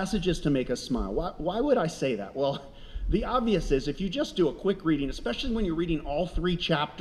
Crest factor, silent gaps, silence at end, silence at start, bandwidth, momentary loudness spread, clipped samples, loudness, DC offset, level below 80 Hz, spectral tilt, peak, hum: 16 dB; none; 0 s; 0 s; 13 kHz; 5 LU; under 0.1%; -29 LUFS; under 0.1%; -38 dBFS; -6 dB/octave; -12 dBFS; none